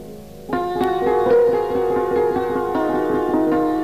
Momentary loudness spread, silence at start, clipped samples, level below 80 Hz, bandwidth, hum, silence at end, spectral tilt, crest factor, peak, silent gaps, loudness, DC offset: 8 LU; 0 s; under 0.1%; -46 dBFS; 15.5 kHz; none; 0 s; -7 dB/octave; 12 dB; -6 dBFS; none; -19 LUFS; 0.6%